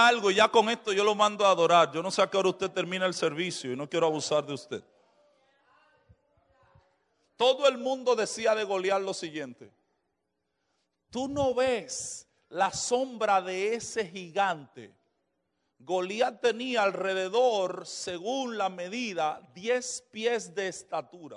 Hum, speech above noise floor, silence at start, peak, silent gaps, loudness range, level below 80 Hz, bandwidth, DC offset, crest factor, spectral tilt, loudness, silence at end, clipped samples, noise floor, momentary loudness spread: none; 53 dB; 0 s; -8 dBFS; none; 8 LU; -70 dBFS; 11 kHz; under 0.1%; 20 dB; -3 dB/octave; -28 LUFS; 0 s; under 0.1%; -81 dBFS; 13 LU